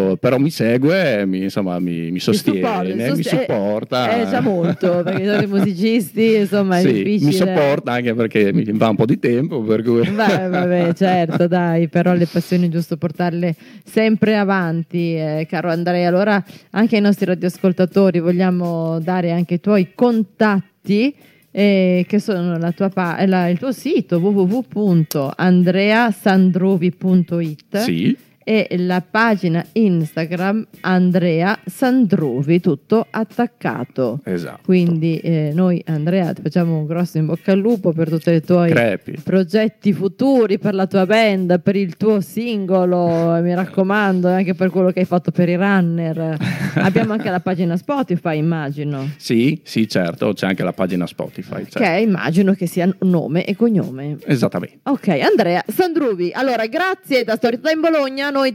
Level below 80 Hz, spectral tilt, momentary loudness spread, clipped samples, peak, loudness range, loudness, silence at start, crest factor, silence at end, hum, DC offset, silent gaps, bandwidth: -68 dBFS; -7.5 dB/octave; 6 LU; under 0.1%; -2 dBFS; 3 LU; -17 LUFS; 0 s; 14 dB; 0 s; none; under 0.1%; none; 15.5 kHz